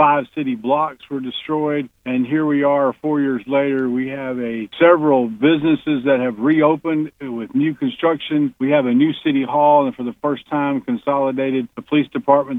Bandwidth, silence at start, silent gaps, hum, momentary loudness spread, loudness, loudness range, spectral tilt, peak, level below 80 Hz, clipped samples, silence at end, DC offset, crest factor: 3.9 kHz; 0 s; none; none; 9 LU; -18 LUFS; 3 LU; -8.5 dB/octave; 0 dBFS; -60 dBFS; under 0.1%; 0 s; under 0.1%; 16 dB